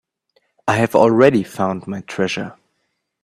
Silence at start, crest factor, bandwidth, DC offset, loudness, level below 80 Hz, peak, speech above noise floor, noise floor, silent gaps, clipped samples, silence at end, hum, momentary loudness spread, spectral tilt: 0.65 s; 18 dB; 15 kHz; under 0.1%; -17 LUFS; -58 dBFS; 0 dBFS; 55 dB; -72 dBFS; none; under 0.1%; 0.7 s; none; 15 LU; -6 dB/octave